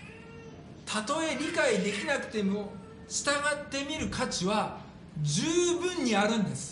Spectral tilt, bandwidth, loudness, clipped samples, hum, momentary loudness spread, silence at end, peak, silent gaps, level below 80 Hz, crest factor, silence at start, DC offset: -4 dB/octave; 10.5 kHz; -30 LUFS; under 0.1%; none; 18 LU; 0 s; -14 dBFS; none; -58 dBFS; 18 dB; 0 s; under 0.1%